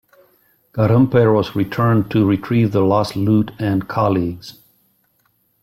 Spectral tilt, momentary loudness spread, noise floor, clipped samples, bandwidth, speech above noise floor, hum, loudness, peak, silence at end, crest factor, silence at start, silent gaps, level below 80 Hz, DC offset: -8.5 dB/octave; 8 LU; -63 dBFS; under 0.1%; 14 kHz; 47 dB; none; -17 LUFS; -4 dBFS; 1.1 s; 14 dB; 0.75 s; none; -50 dBFS; under 0.1%